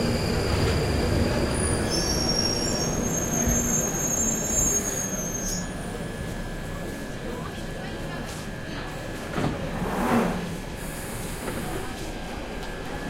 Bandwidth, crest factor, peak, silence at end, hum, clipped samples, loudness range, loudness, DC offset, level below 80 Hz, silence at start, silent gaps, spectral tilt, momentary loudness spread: 16 kHz; 16 dB; -10 dBFS; 0 s; none; under 0.1%; 9 LU; -27 LUFS; under 0.1%; -36 dBFS; 0 s; none; -3.5 dB/octave; 12 LU